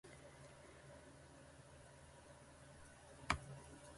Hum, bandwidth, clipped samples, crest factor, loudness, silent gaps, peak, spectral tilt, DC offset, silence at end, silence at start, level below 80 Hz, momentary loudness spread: none; 11.5 kHz; under 0.1%; 34 dB; -53 LUFS; none; -20 dBFS; -4 dB/octave; under 0.1%; 0 s; 0.05 s; -64 dBFS; 18 LU